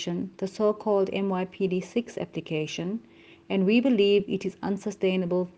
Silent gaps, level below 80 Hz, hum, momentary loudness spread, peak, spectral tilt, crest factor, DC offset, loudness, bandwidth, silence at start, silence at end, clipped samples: none; -68 dBFS; none; 11 LU; -10 dBFS; -6.5 dB/octave; 16 dB; under 0.1%; -27 LUFS; 8.8 kHz; 0 s; 0.05 s; under 0.1%